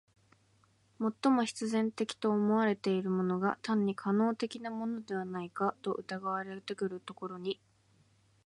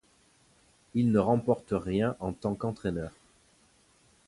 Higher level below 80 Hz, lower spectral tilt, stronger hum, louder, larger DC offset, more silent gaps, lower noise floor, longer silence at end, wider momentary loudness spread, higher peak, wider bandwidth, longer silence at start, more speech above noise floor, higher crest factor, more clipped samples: second, -80 dBFS vs -54 dBFS; second, -6 dB/octave vs -8.5 dB/octave; neither; second, -34 LUFS vs -30 LUFS; neither; neither; first, -69 dBFS vs -65 dBFS; second, 0.9 s vs 1.15 s; about the same, 10 LU vs 9 LU; second, -16 dBFS vs -12 dBFS; about the same, 11.5 kHz vs 11.5 kHz; about the same, 1 s vs 0.95 s; about the same, 36 dB vs 36 dB; about the same, 18 dB vs 20 dB; neither